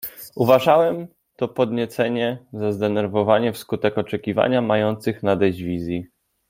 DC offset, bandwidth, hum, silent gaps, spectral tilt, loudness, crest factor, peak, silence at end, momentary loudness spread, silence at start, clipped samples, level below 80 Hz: under 0.1%; 16.5 kHz; none; none; -6.5 dB/octave; -21 LUFS; 20 dB; -2 dBFS; 0.45 s; 11 LU; 0 s; under 0.1%; -58 dBFS